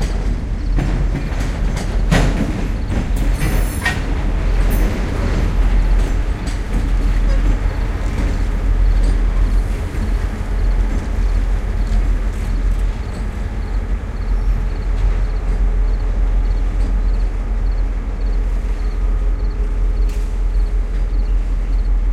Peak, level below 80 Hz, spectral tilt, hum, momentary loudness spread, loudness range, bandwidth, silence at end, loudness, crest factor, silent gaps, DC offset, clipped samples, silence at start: -2 dBFS; -16 dBFS; -6.5 dB/octave; none; 5 LU; 3 LU; 11.5 kHz; 0 s; -21 LUFS; 14 dB; none; under 0.1%; under 0.1%; 0 s